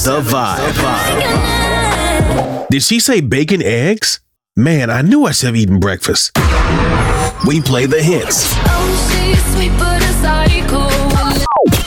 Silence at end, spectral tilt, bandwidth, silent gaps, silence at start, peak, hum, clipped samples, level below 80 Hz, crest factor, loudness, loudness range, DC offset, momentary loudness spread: 0 s; -4.5 dB/octave; 19 kHz; none; 0 s; -2 dBFS; none; under 0.1%; -20 dBFS; 10 dB; -13 LUFS; 1 LU; under 0.1%; 3 LU